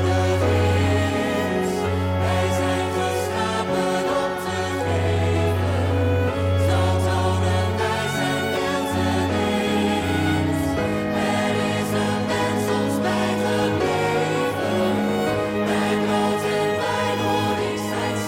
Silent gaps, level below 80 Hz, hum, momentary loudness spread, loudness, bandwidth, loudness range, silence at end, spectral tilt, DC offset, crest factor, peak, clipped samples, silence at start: none; -50 dBFS; none; 3 LU; -22 LUFS; 16.5 kHz; 1 LU; 0 s; -5.5 dB/octave; under 0.1%; 8 dB; -12 dBFS; under 0.1%; 0 s